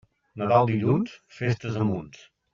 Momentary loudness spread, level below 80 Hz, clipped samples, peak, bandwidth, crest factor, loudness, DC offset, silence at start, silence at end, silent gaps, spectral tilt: 13 LU; -60 dBFS; under 0.1%; -6 dBFS; 7.2 kHz; 20 dB; -25 LUFS; under 0.1%; 0.35 s; 0.45 s; none; -7 dB/octave